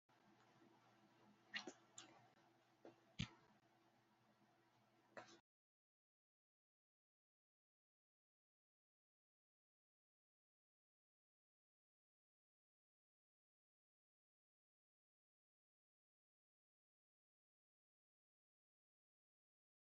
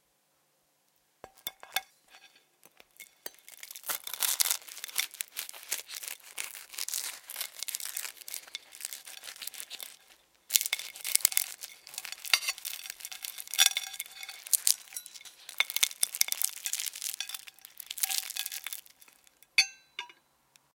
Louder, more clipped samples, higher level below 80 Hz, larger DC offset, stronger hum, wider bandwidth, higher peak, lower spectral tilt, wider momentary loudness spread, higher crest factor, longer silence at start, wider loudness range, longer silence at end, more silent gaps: second, -57 LUFS vs -31 LUFS; neither; about the same, -84 dBFS vs -84 dBFS; neither; neither; second, 7 kHz vs 17 kHz; second, -32 dBFS vs 0 dBFS; first, -3 dB/octave vs 4.5 dB/octave; about the same, 15 LU vs 17 LU; about the same, 38 dB vs 36 dB; second, 0.1 s vs 1.25 s; second, 3 LU vs 9 LU; first, 14.6 s vs 0.7 s; neither